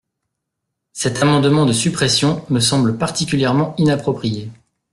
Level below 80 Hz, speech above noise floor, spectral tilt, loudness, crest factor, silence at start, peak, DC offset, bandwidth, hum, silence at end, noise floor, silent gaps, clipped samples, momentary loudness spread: -50 dBFS; 62 dB; -5 dB/octave; -16 LUFS; 14 dB; 0.95 s; -4 dBFS; under 0.1%; 12.5 kHz; none; 0.4 s; -78 dBFS; none; under 0.1%; 9 LU